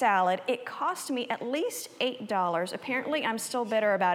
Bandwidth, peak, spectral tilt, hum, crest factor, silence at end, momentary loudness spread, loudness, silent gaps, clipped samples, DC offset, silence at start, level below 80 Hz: 17.5 kHz; -12 dBFS; -3.5 dB/octave; none; 16 dB; 0 s; 6 LU; -30 LUFS; none; under 0.1%; under 0.1%; 0 s; under -90 dBFS